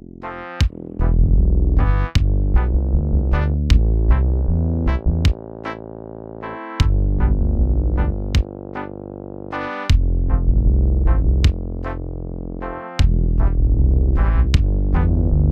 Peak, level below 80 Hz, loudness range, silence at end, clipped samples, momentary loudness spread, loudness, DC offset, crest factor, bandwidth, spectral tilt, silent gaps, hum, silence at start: 0 dBFS; -18 dBFS; 3 LU; 0 s; under 0.1%; 13 LU; -19 LUFS; under 0.1%; 16 dB; 7.8 kHz; -7.5 dB/octave; none; none; 0.2 s